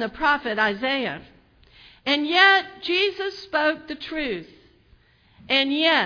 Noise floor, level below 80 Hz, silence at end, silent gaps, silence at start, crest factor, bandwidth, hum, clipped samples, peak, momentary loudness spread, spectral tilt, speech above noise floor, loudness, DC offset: -57 dBFS; -56 dBFS; 0 s; none; 0 s; 20 dB; 5.4 kHz; none; under 0.1%; -4 dBFS; 15 LU; -4 dB/octave; 35 dB; -21 LUFS; under 0.1%